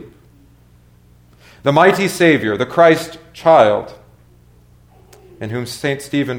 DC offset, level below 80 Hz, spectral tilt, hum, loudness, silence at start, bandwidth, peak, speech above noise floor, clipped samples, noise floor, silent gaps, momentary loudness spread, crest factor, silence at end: under 0.1%; -52 dBFS; -5.5 dB/octave; 60 Hz at -50 dBFS; -14 LUFS; 0 s; 17.5 kHz; 0 dBFS; 34 dB; under 0.1%; -48 dBFS; none; 15 LU; 18 dB; 0 s